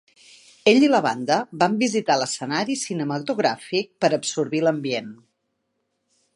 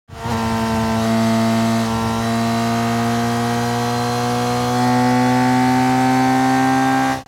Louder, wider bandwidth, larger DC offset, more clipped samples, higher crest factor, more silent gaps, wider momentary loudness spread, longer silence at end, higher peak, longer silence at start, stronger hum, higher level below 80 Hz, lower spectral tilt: second, -22 LUFS vs -17 LUFS; second, 11.5 kHz vs 17 kHz; neither; neither; first, 20 dB vs 12 dB; neither; first, 9 LU vs 4 LU; first, 1.2 s vs 0.05 s; first, -2 dBFS vs -6 dBFS; first, 0.65 s vs 0.1 s; neither; second, -74 dBFS vs -42 dBFS; second, -4 dB/octave vs -5.5 dB/octave